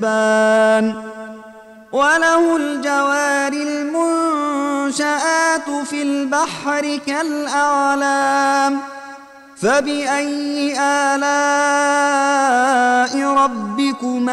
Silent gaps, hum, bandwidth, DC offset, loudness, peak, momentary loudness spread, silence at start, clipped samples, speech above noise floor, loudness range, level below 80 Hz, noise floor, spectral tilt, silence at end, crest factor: none; none; 13 kHz; under 0.1%; -17 LUFS; -6 dBFS; 7 LU; 0 s; under 0.1%; 23 dB; 3 LU; -62 dBFS; -40 dBFS; -3 dB/octave; 0 s; 12 dB